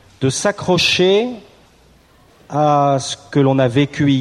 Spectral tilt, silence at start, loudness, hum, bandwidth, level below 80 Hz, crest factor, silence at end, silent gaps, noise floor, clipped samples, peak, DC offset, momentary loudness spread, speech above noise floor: -5 dB/octave; 0.2 s; -16 LUFS; none; 13 kHz; -52 dBFS; 14 dB; 0 s; none; -50 dBFS; under 0.1%; -2 dBFS; under 0.1%; 7 LU; 35 dB